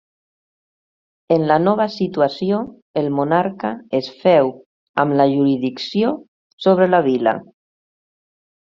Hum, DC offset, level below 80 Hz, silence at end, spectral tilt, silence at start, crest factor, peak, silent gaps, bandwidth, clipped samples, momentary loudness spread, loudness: none; under 0.1%; -64 dBFS; 1.3 s; -5.5 dB/octave; 1.3 s; 18 dB; -2 dBFS; 2.82-2.94 s, 4.66-4.94 s, 6.28-6.58 s; 7.2 kHz; under 0.1%; 8 LU; -18 LUFS